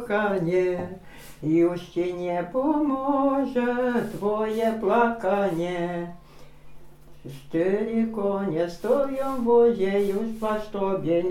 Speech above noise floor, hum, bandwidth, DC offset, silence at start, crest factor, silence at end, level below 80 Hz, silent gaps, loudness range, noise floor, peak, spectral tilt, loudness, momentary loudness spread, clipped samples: 20 dB; none; 16 kHz; under 0.1%; 0 s; 18 dB; 0 s; -52 dBFS; none; 4 LU; -44 dBFS; -8 dBFS; -7.5 dB/octave; -25 LUFS; 7 LU; under 0.1%